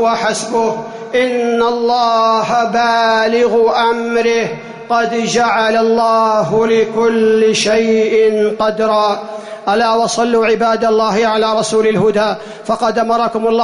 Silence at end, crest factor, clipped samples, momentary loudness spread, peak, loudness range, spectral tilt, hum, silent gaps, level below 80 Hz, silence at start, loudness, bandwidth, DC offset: 0 s; 10 dB; under 0.1%; 5 LU; -4 dBFS; 1 LU; -4 dB/octave; none; none; -52 dBFS; 0 s; -13 LUFS; 11 kHz; under 0.1%